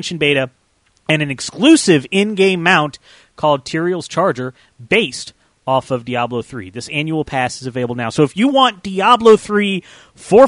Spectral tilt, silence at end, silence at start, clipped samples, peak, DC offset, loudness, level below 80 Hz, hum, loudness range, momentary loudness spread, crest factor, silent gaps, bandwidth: -4.5 dB/octave; 0 s; 0 s; under 0.1%; 0 dBFS; under 0.1%; -15 LUFS; -52 dBFS; none; 5 LU; 14 LU; 16 dB; none; 11 kHz